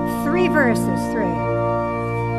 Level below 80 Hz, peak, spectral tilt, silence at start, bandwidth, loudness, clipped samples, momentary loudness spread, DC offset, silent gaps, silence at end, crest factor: -40 dBFS; -6 dBFS; -7 dB/octave; 0 s; 14.5 kHz; -20 LUFS; under 0.1%; 6 LU; under 0.1%; none; 0 s; 14 dB